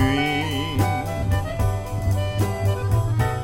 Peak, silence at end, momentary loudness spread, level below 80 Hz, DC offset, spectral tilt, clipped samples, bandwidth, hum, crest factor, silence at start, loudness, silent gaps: -8 dBFS; 0 s; 3 LU; -32 dBFS; 0.4%; -6 dB/octave; under 0.1%; 16.5 kHz; none; 14 dB; 0 s; -23 LUFS; none